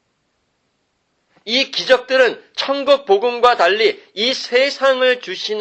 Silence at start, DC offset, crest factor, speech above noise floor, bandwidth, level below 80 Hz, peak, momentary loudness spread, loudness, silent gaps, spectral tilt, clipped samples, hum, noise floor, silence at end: 1.45 s; under 0.1%; 16 dB; 51 dB; 8.4 kHz; -66 dBFS; 0 dBFS; 7 LU; -16 LUFS; none; -2 dB/octave; under 0.1%; none; -67 dBFS; 0 s